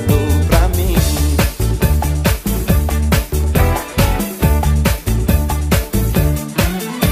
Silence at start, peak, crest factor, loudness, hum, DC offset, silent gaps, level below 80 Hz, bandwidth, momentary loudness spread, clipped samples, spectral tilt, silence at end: 0 s; 0 dBFS; 14 dB; -16 LUFS; none; under 0.1%; none; -18 dBFS; 15.5 kHz; 3 LU; under 0.1%; -5.5 dB/octave; 0 s